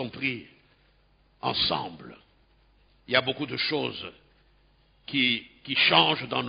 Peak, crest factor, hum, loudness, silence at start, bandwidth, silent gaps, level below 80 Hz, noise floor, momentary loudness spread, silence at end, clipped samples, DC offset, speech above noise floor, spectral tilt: -4 dBFS; 24 dB; none; -25 LUFS; 0 s; 5.2 kHz; none; -62 dBFS; -63 dBFS; 19 LU; 0 s; under 0.1%; under 0.1%; 36 dB; -8 dB/octave